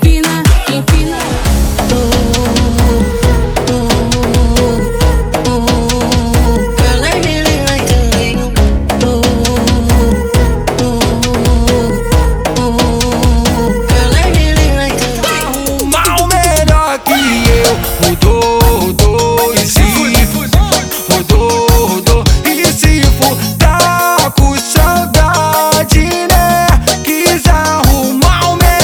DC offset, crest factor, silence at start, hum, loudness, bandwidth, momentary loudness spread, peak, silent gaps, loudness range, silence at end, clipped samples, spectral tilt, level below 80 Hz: under 0.1%; 10 dB; 0 s; none; -10 LUFS; over 20 kHz; 4 LU; 0 dBFS; none; 2 LU; 0 s; under 0.1%; -4.5 dB/octave; -14 dBFS